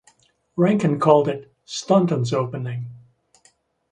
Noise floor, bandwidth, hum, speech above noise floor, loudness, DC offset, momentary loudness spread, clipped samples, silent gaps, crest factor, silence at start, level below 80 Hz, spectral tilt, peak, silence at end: -61 dBFS; 10 kHz; none; 41 dB; -20 LUFS; under 0.1%; 16 LU; under 0.1%; none; 20 dB; 0.55 s; -62 dBFS; -7 dB/octave; -2 dBFS; 0.95 s